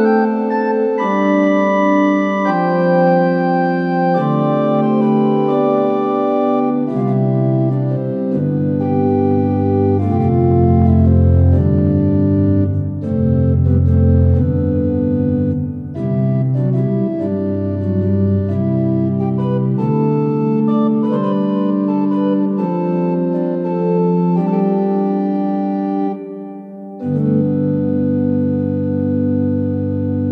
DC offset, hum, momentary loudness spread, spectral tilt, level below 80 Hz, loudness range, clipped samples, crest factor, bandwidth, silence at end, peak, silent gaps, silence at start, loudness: under 0.1%; none; 6 LU; -10.5 dB/octave; -40 dBFS; 4 LU; under 0.1%; 12 dB; 6.2 kHz; 0 s; -2 dBFS; none; 0 s; -16 LUFS